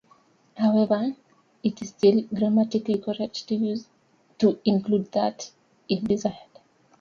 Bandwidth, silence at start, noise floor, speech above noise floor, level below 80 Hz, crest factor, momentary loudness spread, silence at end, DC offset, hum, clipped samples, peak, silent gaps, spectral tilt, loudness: 7.2 kHz; 0.55 s; -60 dBFS; 36 dB; -64 dBFS; 18 dB; 10 LU; 0.6 s; under 0.1%; none; under 0.1%; -8 dBFS; none; -6.5 dB/octave; -25 LUFS